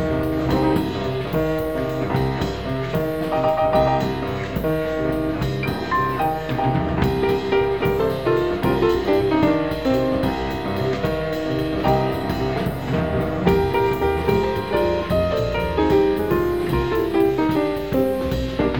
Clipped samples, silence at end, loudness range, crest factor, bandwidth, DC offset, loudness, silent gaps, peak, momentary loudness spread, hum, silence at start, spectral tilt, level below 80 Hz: under 0.1%; 0 s; 2 LU; 16 dB; 18.5 kHz; 0.7%; -21 LUFS; none; -6 dBFS; 5 LU; none; 0 s; -7.5 dB/octave; -34 dBFS